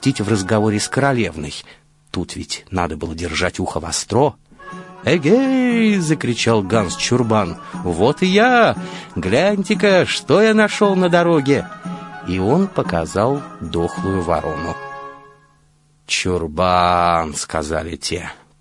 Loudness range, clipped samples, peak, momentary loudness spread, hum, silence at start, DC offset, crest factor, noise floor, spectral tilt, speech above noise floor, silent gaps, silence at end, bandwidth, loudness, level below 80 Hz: 7 LU; under 0.1%; -2 dBFS; 14 LU; none; 0 s; under 0.1%; 16 dB; -55 dBFS; -5 dB/octave; 38 dB; none; 0.25 s; 11.5 kHz; -17 LUFS; -46 dBFS